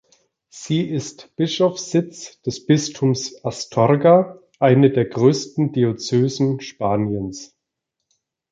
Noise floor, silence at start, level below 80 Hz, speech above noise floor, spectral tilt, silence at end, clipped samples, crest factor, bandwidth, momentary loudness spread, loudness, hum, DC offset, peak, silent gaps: -80 dBFS; 0.55 s; -56 dBFS; 61 dB; -6 dB/octave; 1.05 s; under 0.1%; 18 dB; 9.2 kHz; 14 LU; -19 LUFS; none; under 0.1%; -2 dBFS; none